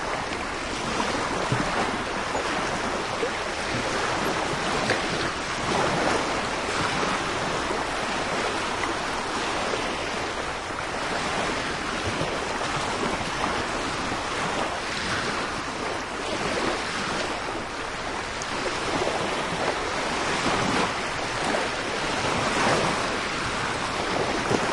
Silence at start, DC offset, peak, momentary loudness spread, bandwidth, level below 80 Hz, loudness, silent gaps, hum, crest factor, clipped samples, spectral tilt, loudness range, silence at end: 0 s; under 0.1%; -6 dBFS; 5 LU; 12 kHz; -46 dBFS; -26 LUFS; none; none; 20 dB; under 0.1%; -3.5 dB/octave; 2 LU; 0 s